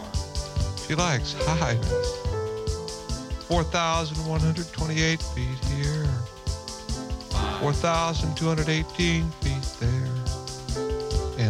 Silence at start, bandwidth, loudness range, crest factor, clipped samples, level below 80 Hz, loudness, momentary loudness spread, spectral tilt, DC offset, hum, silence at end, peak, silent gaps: 0 s; 13.5 kHz; 2 LU; 18 dB; under 0.1%; -34 dBFS; -27 LUFS; 9 LU; -5 dB/octave; under 0.1%; none; 0 s; -8 dBFS; none